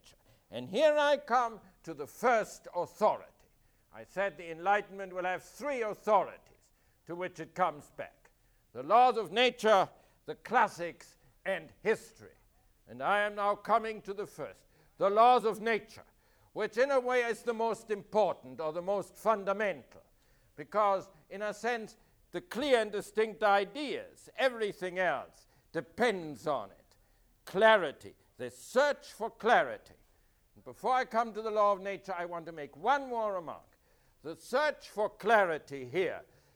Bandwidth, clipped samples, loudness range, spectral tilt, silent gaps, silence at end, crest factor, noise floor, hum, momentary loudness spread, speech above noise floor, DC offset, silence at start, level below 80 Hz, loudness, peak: over 20 kHz; under 0.1%; 5 LU; -4 dB/octave; none; 0.35 s; 22 dB; -68 dBFS; none; 18 LU; 37 dB; under 0.1%; 0.5 s; -70 dBFS; -32 LUFS; -12 dBFS